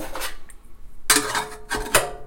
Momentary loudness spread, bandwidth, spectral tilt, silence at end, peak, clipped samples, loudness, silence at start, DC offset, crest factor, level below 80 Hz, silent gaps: 13 LU; 17 kHz; -1 dB/octave; 0 s; -4 dBFS; under 0.1%; -22 LUFS; 0 s; under 0.1%; 22 dB; -40 dBFS; none